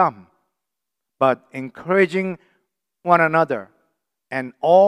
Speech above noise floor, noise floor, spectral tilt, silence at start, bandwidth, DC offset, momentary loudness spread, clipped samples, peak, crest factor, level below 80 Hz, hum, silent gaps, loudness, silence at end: 66 dB; -84 dBFS; -7 dB/octave; 0 s; 11 kHz; under 0.1%; 15 LU; under 0.1%; 0 dBFS; 20 dB; -74 dBFS; none; none; -20 LUFS; 0 s